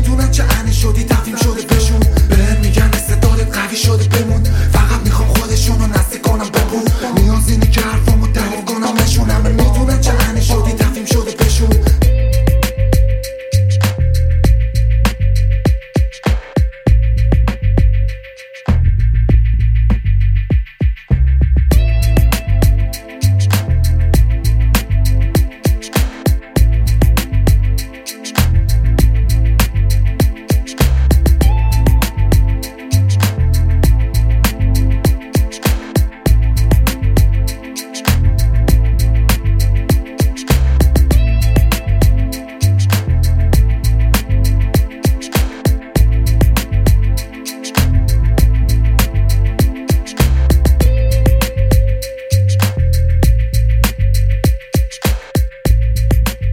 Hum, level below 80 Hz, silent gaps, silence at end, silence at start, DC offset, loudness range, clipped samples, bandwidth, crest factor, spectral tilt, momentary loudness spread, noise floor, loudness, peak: none; -14 dBFS; none; 0 s; 0 s; under 0.1%; 2 LU; under 0.1%; 16.5 kHz; 12 dB; -5.5 dB/octave; 5 LU; -33 dBFS; -14 LUFS; 0 dBFS